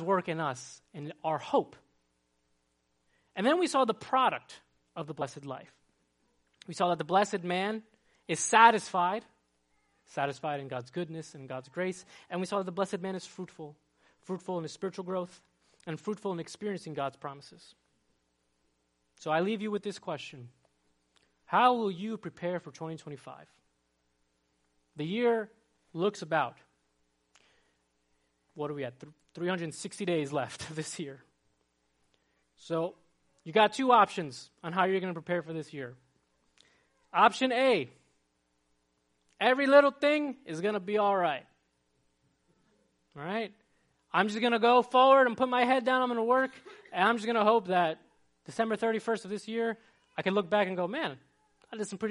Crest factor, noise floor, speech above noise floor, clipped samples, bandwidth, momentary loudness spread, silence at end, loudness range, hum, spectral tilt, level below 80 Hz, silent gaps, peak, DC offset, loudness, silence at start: 24 dB; -76 dBFS; 46 dB; under 0.1%; 11.5 kHz; 19 LU; 0 s; 11 LU; none; -4.5 dB/octave; -80 dBFS; none; -6 dBFS; under 0.1%; -30 LUFS; 0 s